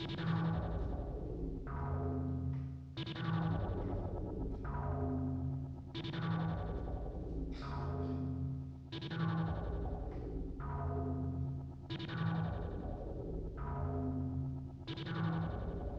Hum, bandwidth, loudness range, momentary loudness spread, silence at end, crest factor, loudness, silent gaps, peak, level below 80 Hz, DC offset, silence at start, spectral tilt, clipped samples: none; 6.2 kHz; 1 LU; 7 LU; 0 s; 14 dB; -41 LUFS; none; -24 dBFS; -46 dBFS; under 0.1%; 0 s; -9 dB/octave; under 0.1%